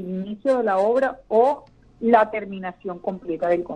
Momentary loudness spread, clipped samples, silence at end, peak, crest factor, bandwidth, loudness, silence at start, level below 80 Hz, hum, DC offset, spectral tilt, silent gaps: 13 LU; under 0.1%; 0 s; -2 dBFS; 20 dB; 9.4 kHz; -22 LUFS; 0 s; -58 dBFS; none; under 0.1%; -7.5 dB/octave; none